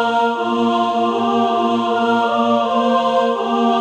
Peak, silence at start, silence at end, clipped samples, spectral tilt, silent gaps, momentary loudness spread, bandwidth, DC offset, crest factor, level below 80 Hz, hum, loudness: -4 dBFS; 0 s; 0 s; under 0.1%; -5 dB/octave; none; 2 LU; 8.8 kHz; under 0.1%; 12 dB; -62 dBFS; none; -17 LUFS